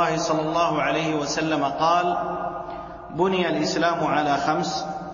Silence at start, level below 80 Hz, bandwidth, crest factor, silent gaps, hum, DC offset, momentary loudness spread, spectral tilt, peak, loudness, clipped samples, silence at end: 0 s; -52 dBFS; 7.4 kHz; 16 dB; none; none; under 0.1%; 9 LU; -4.5 dB/octave; -8 dBFS; -23 LUFS; under 0.1%; 0 s